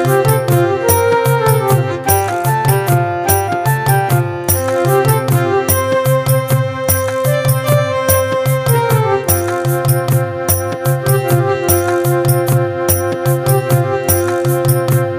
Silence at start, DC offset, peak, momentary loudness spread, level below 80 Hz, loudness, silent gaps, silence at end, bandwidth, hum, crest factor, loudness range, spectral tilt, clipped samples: 0 s; under 0.1%; 0 dBFS; 3 LU; -40 dBFS; -14 LUFS; none; 0 s; 16 kHz; none; 14 dB; 1 LU; -5.5 dB/octave; under 0.1%